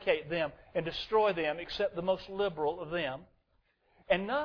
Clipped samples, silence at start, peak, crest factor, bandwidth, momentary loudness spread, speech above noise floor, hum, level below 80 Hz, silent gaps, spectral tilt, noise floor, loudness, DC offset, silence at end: under 0.1%; 0 s; -14 dBFS; 18 dB; 5.4 kHz; 7 LU; 41 dB; none; -60 dBFS; none; -6.5 dB/octave; -73 dBFS; -33 LUFS; under 0.1%; 0 s